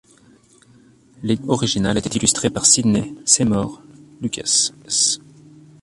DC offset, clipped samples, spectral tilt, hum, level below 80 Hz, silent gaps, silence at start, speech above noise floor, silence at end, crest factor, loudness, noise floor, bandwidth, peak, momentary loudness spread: under 0.1%; under 0.1%; -3 dB/octave; none; -46 dBFS; none; 1.2 s; 33 dB; 0.65 s; 20 dB; -17 LUFS; -52 dBFS; 11.5 kHz; 0 dBFS; 13 LU